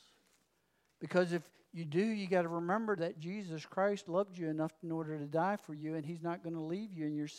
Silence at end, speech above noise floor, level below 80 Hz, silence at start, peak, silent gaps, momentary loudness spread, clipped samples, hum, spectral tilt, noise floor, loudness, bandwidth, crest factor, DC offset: 0 s; 40 dB; under -90 dBFS; 1 s; -18 dBFS; none; 8 LU; under 0.1%; none; -7 dB/octave; -77 dBFS; -37 LUFS; 13 kHz; 20 dB; under 0.1%